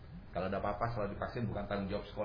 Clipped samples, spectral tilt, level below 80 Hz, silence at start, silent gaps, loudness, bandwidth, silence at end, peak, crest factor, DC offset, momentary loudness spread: under 0.1%; -6 dB/octave; -50 dBFS; 0 s; none; -38 LUFS; 5.2 kHz; 0 s; -20 dBFS; 18 dB; under 0.1%; 4 LU